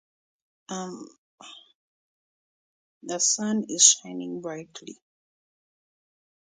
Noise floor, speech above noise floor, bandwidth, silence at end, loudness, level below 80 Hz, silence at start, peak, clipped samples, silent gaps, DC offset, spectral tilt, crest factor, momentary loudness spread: under -90 dBFS; over 64 dB; 9.6 kHz; 1.55 s; -22 LUFS; -80 dBFS; 0.7 s; -2 dBFS; under 0.1%; 1.18-1.38 s, 1.75-3.01 s; under 0.1%; -1.5 dB/octave; 28 dB; 26 LU